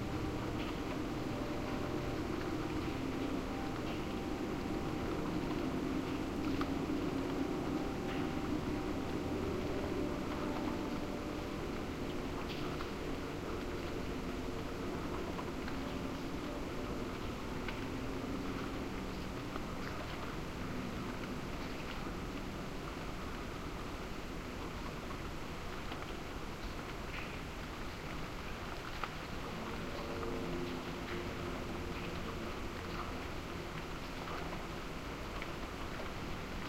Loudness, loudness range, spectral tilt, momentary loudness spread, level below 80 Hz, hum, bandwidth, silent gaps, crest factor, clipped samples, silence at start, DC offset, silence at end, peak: -41 LUFS; 6 LU; -5.5 dB/octave; 6 LU; -48 dBFS; none; 16 kHz; none; 18 dB; under 0.1%; 0 s; under 0.1%; 0 s; -22 dBFS